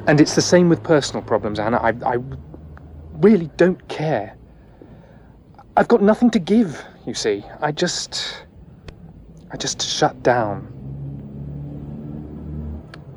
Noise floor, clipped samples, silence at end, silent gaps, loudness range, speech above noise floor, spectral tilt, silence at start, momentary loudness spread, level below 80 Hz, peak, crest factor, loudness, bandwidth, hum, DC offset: -46 dBFS; under 0.1%; 0 s; none; 5 LU; 28 dB; -5 dB/octave; 0 s; 19 LU; -44 dBFS; -2 dBFS; 18 dB; -19 LUFS; 12 kHz; none; under 0.1%